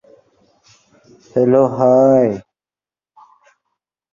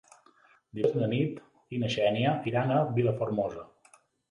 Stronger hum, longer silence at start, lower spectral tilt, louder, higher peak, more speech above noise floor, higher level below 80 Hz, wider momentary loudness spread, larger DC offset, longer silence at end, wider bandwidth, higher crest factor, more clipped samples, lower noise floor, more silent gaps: neither; first, 1.35 s vs 0.75 s; first, -9 dB/octave vs -7.5 dB/octave; first, -14 LUFS vs -29 LUFS; first, -2 dBFS vs -12 dBFS; first, over 78 dB vs 34 dB; about the same, -60 dBFS vs -64 dBFS; about the same, 11 LU vs 12 LU; neither; first, 1.75 s vs 0.65 s; second, 7.2 kHz vs 11 kHz; about the same, 16 dB vs 18 dB; neither; first, under -90 dBFS vs -62 dBFS; neither